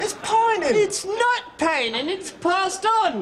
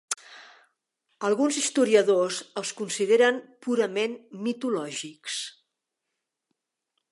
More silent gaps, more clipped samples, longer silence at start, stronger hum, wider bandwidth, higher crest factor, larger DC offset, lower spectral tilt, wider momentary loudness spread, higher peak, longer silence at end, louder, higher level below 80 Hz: neither; neither; about the same, 0 s vs 0.1 s; neither; first, 14.5 kHz vs 11.5 kHz; second, 16 dB vs 22 dB; neither; about the same, -2 dB/octave vs -3 dB/octave; second, 5 LU vs 13 LU; about the same, -6 dBFS vs -6 dBFS; second, 0 s vs 1.6 s; first, -21 LUFS vs -26 LUFS; first, -60 dBFS vs -84 dBFS